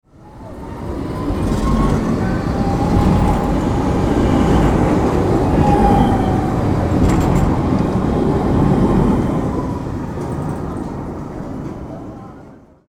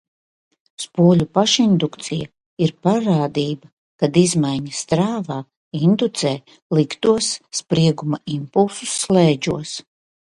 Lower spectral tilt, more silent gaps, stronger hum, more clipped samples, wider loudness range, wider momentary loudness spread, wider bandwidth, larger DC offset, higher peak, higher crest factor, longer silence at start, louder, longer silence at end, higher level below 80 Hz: first, -8 dB/octave vs -5.5 dB/octave; second, none vs 2.46-2.57 s, 3.73-3.99 s, 5.57-5.71 s, 6.62-6.70 s; neither; neither; first, 6 LU vs 2 LU; about the same, 14 LU vs 12 LU; first, 15.5 kHz vs 11.5 kHz; neither; about the same, 0 dBFS vs -2 dBFS; about the same, 16 dB vs 18 dB; second, 0.2 s vs 0.8 s; about the same, -17 LUFS vs -19 LUFS; second, 0.35 s vs 0.55 s; first, -24 dBFS vs -54 dBFS